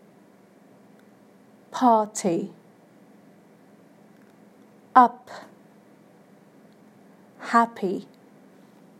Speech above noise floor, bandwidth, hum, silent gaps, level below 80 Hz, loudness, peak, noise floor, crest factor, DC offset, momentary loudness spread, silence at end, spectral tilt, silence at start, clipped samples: 33 dB; 15 kHz; none; none; -82 dBFS; -22 LUFS; -2 dBFS; -54 dBFS; 26 dB; under 0.1%; 23 LU; 1 s; -5 dB/octave; 1.75 s; under 0.1%